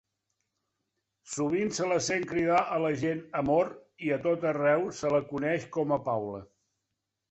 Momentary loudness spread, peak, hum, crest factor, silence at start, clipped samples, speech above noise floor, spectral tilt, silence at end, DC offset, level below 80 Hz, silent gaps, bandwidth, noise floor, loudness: 7 LU; -14 dBFS; none; 16 dB; 1.25 s; under 0.1%; 56 dB; -5 dB/octave; 0.85 s; under 0.1%; -64 dBFS; none; 8.4 kHz; -84 dBFS; -29 LUFS